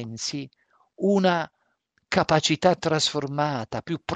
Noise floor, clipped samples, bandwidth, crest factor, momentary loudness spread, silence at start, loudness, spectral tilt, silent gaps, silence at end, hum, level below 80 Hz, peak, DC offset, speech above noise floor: -71 dBFS; under 0.1%; 9.4 kHz; 20 dB; 10 LU; 0 s; -24 LUFS; -4.5 dB/octave; none; 0 s; none; -58 dBFS; -4 dBFS; under 0.1%; 47 dB